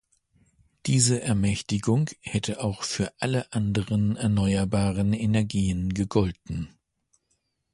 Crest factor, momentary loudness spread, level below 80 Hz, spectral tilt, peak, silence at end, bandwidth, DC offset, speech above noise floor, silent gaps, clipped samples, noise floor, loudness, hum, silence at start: 18 dB; 7 LU; -44 dBFS; -5.5 dB/octave; -8 dBFS; 1.05 s; 11.5 kHz; under 0.1%; 50 dB; none; under 0.1%; -74 dBFS; -26 LUFS; none; 0.85 s